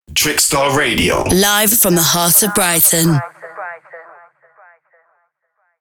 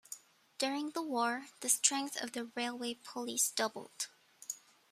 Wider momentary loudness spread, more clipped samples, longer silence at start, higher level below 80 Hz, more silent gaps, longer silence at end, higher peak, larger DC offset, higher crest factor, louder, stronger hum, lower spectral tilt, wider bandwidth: first, 19 LU vs 15 LU; neither; about the same, 0.1 s vs 0.1 s; first, -40 dBFS vs -88 dBFS; neither; first, 1.8 s vs 0.35 s; first, 0 dBFS vs -12 dBFS; neither; second, 16 dB vs 26 dB; first, -11 LUFS vs -35 LUFS; neither; first, -2.5 dB/octave vs -0.5 dB/octave; first, over 20 kHz vs 15.5 kHz